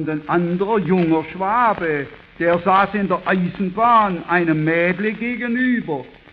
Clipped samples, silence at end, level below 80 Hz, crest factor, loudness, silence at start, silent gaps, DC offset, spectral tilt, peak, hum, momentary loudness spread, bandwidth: under 0.1%; 0.2 s; -52 dBFS; 16 dB; -18 LUFS; 0 s; none; under 0.1%; -9.5 dB/octave; -2 dBFS; none; 7 LU; 5 kHz